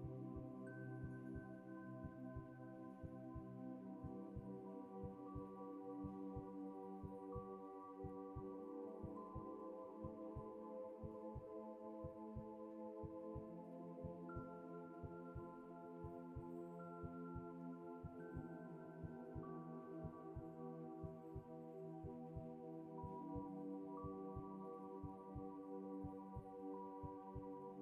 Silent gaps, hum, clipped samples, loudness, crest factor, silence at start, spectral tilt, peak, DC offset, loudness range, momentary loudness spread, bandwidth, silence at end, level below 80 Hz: none; none; under 0.1%; -54 LUFS; 16 dB; 0 s; -10.5 dB/octave; -38 dBFS; under 0.1%; 2 LU; 3 LU; 10 kHz; 0 s; -68 dBFS